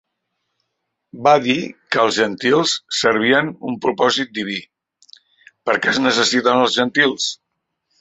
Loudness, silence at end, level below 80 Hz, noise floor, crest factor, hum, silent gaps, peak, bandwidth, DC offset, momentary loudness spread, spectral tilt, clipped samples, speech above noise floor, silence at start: -17 LUFS; 0.65 s; -62 dBFS; -75 dBFS; 18 dB; none; none; 0 dBFS; 8.4 kHz; under 0.1%; 9 LU; -3 dB/octave; under 0.1%; 58 dB; 1.15 s